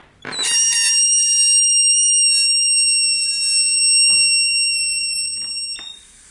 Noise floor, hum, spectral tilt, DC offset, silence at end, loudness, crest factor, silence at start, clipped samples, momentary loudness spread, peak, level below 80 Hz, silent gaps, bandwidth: -38 dBFS; none; 4 dB/octave; under 0.1%; 0.35 s; -13 LUFS; 12 dB; 0.25 s; under 0.1%; 11 LU; -6 dBFS; -58 dBFS; none; 11.5 kHz